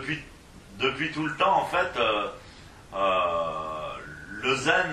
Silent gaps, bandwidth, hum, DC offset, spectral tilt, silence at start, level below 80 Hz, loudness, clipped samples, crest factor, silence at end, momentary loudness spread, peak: none; 13 kHz; none; under 0.1%; -4 dB/octave; 0 s; -54 dBFS; -27 LUFS; under 0.1%; 20 dB; 0 s; 16 LU; -8 dBFS